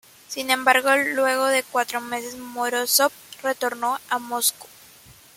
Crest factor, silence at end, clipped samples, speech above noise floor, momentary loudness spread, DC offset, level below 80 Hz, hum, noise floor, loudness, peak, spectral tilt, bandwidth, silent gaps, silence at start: 22 dB; 0.25 s; under 0.1%; 27 dB; 12 LU; under 0.1%; -70 dBFS; none; -49 dBFS; -22 LUFS; -2 dBFS; 0 dB/octave; 17 kHz; none; 0.3 s